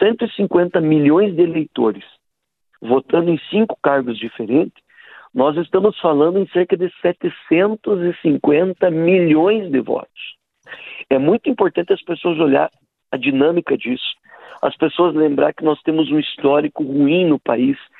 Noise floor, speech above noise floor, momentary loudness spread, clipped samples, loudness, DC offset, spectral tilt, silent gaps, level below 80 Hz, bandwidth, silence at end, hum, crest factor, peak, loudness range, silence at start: -76 dBFS; 60 dB; 10 LU; under 0.1%; -17 LUFS; under 0.1%; -10 dB/octave; none; -62 dBFS; 4.1 kHz; 0.2 s; none; 16 dB; -2 dBFS; 3 LU; 0 s